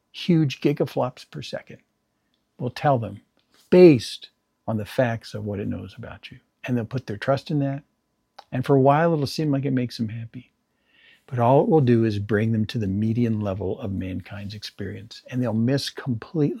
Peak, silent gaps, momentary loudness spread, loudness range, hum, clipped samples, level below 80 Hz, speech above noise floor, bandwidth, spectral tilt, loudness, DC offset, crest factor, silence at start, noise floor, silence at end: -2 dBFS; none; 18 LU; 7 LU; none; under 0.1%; -62 dBFS; 50 dB; 14 kHz; -7.5 dB/octave; -23 LUFS; under 0.1%; 22 dB; 0.15 s; -72 dBFS; 0 s